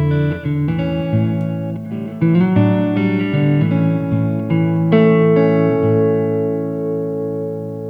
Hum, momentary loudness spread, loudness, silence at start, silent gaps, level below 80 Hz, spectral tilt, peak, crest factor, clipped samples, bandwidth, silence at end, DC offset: none; 9 LU; -16 LUFS; 0 s; none; -46 dBFS; -10.5 dB/octave; 0 dBFS; 16 dB; under 0.1%; 5 kHz; 0 s; under 0.1%